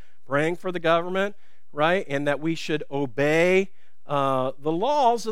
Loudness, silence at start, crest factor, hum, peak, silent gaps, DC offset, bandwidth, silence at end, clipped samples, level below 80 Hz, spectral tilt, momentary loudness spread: -24 LUFS; 0.3 s; 18 dB; none; -6 dBFS; none; 2%; 15.5 kHz; 0 s; under 0.1%; -74 dBFS; -5.5 dB/octave; 8 LU